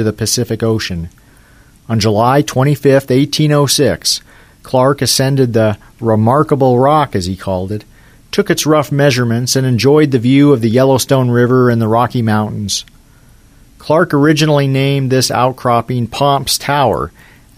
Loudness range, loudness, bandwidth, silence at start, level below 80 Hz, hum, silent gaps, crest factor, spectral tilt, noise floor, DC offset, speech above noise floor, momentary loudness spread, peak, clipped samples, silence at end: 3 LU; -12 LUFS; 16 kHz; 0 s; -42 dBFS; none; none; 12 dB; -5 dB/octave; -44 dBFS; under 0.1%; 32 dB; 9 LU; 0 dBFS; under 0.1%; 0.5 s